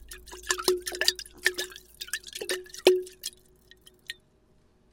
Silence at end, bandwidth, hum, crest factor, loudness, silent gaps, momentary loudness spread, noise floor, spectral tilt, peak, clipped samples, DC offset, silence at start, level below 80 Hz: 0.8 s; 17 kHz; none; 30 dB; -28 LUFS; none; 19 LU; -63 dBFS; -1 dB/octave; -2 dBFS; under 0.1%; under 0.1%; 0.1 s; -58 dBFS